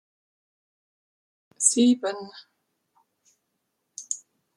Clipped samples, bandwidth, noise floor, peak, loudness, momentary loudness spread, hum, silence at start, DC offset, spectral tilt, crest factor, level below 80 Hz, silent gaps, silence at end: under 0.1%; 12.5 kHz; -78 dBFS; -4 dBFS; -23 LUFS; 24 LU; none; 1.6 s; under 0.1%; -2 dB/octave; 26 dB; -80 dBFS; none; 0.4 s